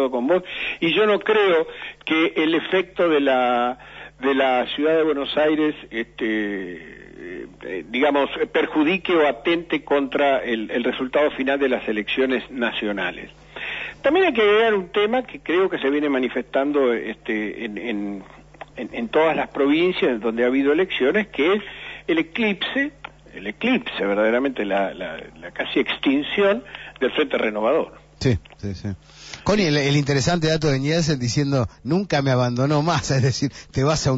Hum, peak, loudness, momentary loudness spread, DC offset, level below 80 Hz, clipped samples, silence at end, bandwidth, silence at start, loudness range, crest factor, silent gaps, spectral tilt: none; -8 dBFS; -21 LUFS; 14 LU; under 0.1%; -50 dBFS; under 0.1%; 0 s; 8 kHz; 0 s; 3 LU; 14 dB; none; -5.5 dB/octave